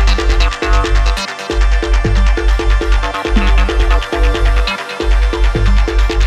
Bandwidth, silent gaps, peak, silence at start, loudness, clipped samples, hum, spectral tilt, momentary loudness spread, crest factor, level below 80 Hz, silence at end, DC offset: 10 kHz; none; 0 dBFS; 0 s; -15 LUFS; under 0.1%; none; -5.5 dB/octave; 3 LU; 10 dB; -12 dBFS; 0 s; under 0.1%